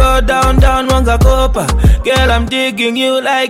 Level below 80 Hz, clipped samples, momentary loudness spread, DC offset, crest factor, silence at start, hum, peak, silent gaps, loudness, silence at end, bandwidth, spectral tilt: -14 dBFS; under 0.1%; 3 LU; under 0.1%; 10 dB; 0 s; none; 0 dBFS; none; -11 LUFS; 0 s; 16 kHz; -5 dB/octave